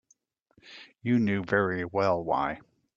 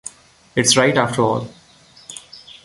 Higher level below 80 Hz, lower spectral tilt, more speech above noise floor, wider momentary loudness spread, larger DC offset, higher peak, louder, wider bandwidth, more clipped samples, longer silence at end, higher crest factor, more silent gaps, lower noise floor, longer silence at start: second, -62 dBFS vs -56 dBFS; first, -8 dB/octave vs -3 dB/octave; first, 41 dB vs 32 dB; about the same, 21 LU vs 22 LU; neither; second, -10 dBFS vs 0 dBFS; second, -28 LUFS vs -16 LUFS; second, 7.4 kHz vs 11.5 kHz; neither; first, 0.4 s vs 0.15 s; about the same, 18 dB vs 20 dB; neither; first, -69 dBFS vs -49 dBFS; first, 0.65 s vs 0.05 s